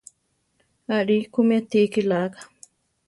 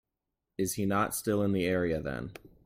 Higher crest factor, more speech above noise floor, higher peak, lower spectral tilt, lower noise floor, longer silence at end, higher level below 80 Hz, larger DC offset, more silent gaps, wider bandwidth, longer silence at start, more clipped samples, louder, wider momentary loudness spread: about the same, 16 dB vs 18 dB; second, 49 dB vs 56 dB; first, -8 dBFS vs -14 dBFS; about the same, -6.5 dB/octave vs -5.5 dB/octave; second, -70 dBFS vs -87 dBFS; first, 0.65 s vs 0.2 s; second, -68 dBFS vs -56 dBFS; neither; neither; second, 11.5 kHz vs 16.5 kHz; first, 0.9 s vs 0.6 s; neither; first, -22 LUFS vs -31 LUFS; about the same, 13 LU vs 11 LU